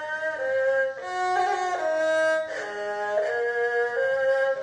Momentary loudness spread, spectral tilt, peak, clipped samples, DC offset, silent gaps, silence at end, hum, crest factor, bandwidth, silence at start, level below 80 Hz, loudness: 6 LU; -2.5 dB/octave; -12 dBFS; under 0.1%; under 0.1%; none; 0 s; none; 12 dB; 10 kHz; 0 s; -72 dBFS; -25 LUFS